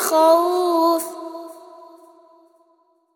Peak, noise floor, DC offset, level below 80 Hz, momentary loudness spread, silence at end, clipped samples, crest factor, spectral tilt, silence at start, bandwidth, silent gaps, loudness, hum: -2 dBFS; -61 dBFS; under 0.1%; -84 dBFS; 21 LU; 1.55 s; under 0.1%; 20 dB; -1.5 dB/octave; 0 s; over 20 kHz; none; -18 LUFS; none